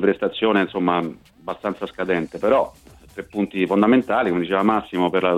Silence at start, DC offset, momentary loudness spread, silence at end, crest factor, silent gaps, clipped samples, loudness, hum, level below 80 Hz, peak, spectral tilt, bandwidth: 0 s; under 0.1%; 14 LU; 0 s; 18 dB; none; under 0.1%; -21 LUFS; none; -54 dBFS; -4 dBFS; -7 dB/octave; 12.5 kHz